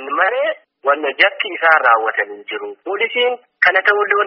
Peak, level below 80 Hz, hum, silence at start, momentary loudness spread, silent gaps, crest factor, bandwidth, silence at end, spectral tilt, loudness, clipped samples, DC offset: 0 dBFS; -72 dBFS; none; 0 s; 12 LU; none; 16 dB; 5.8 kHz; 0 s; 3.5 dB/octave; -15 LUFS; under 0.1%; under 0.1%